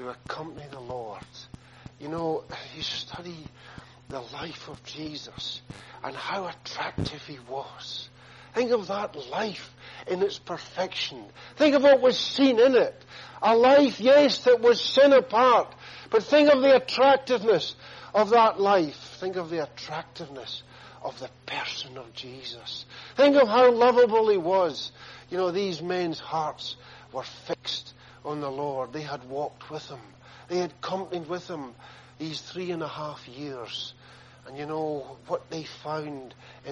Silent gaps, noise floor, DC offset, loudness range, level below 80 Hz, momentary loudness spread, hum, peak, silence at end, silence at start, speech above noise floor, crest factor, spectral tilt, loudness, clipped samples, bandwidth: none; -51 dBFS; under 0.1%; 16 LU; -62 dBFS; 21 LU; none; -8 dBFS; 0 s; 0 s; 26 dB; 18 dB; -5 dB/octave; -24 LUFS; under 0.1%; 7.8 kHz